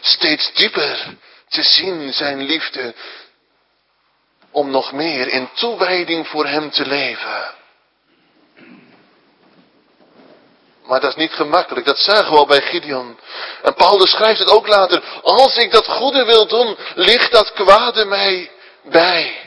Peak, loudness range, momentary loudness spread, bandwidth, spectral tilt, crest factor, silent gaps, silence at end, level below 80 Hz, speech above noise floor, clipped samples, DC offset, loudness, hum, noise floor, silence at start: 0 dBFS; 11 LU; 14 LU; 11 kHz; -3.5 dB/octave; 16 dB; none; 0 s; -54 dBFS; 47 dB; 0.2%; under 0.1%; -14 LUFS; none; -62 dBFS; 0 s